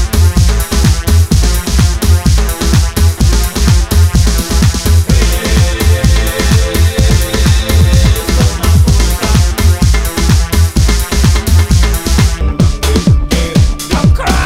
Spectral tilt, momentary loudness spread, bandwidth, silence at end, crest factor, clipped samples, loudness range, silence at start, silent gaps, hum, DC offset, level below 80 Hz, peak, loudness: -5 dB/octave; 2 LU; 16.5 kHz; 0 s; 8 dB; 0.7%; 1 LU; 0 s; none; none; under 0.1%; -12 dBFS; 0 dBFS; -11 LUFS